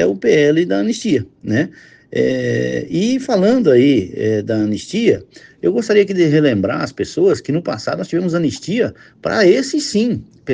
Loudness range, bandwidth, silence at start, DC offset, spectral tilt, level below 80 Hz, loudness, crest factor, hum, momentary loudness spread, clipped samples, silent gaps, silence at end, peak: 2 LU; 9.8 kHz; 0 s; under 0.1%; -6 dB/octave; -54 dBFS; -16 LUFS; 14 dB; none; 8 LU; under 0.1%; none; 0 s; 0 dBFS